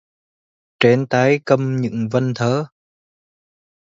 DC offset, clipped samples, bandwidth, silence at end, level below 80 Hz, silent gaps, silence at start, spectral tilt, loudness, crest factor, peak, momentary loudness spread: under 0.1%; under 0.1%; 7.6 kHz; 1.2 s; -60 dBFS; none; 0.8 s; -6.5 dB/octave; -18 LUFS; 20 dB; 0 dBFS; 6 LU